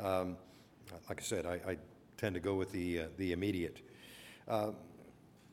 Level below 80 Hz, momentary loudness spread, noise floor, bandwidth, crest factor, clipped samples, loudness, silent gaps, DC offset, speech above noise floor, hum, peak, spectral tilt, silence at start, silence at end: -64 dBFS; 19 LU; -61 dBFS; 17.5 kHz; 20 dB; under 0.1%; -39 LUFS; none; under 0.1%; 22 dB; none; -20 dBFS; -5.5 dB/octave; 0 s; 0 s